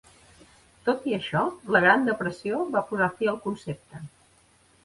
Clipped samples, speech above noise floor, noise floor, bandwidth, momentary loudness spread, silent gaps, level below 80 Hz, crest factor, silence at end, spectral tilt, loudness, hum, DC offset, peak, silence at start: under 0.1%; 35 dB; -60 dBFS; 11.5 kHz; 18 LU; none; -62 dBFS; 22 dB; 0.75 s; -6 dB/octave; -25 LUFS; none; under 0.1%; -6 dBFS; 0.85 s